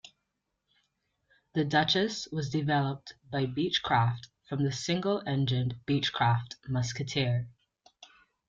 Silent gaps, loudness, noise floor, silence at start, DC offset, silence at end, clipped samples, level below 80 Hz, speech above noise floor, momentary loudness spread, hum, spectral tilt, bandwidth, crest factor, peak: none; -30 LUFS; -82 dBFS; 1.55 s; under 0.1%; 0.45 s; under 0.1%; -62 dBFS; 53 dB; 8 LU; none; -5.5 dB/octave; 7.8 kHz; 18 dB; -12 dBFS